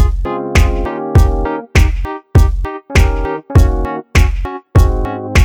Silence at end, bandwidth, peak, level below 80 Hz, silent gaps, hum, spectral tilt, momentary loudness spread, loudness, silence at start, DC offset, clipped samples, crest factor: 0 s; 16 kHz; 0 dBFS; -14 dBFS; none; none; -6 dB/octave; 7 LU; -15 LUFS; 0 s; under 0.1%; under 0.1%; 12 dB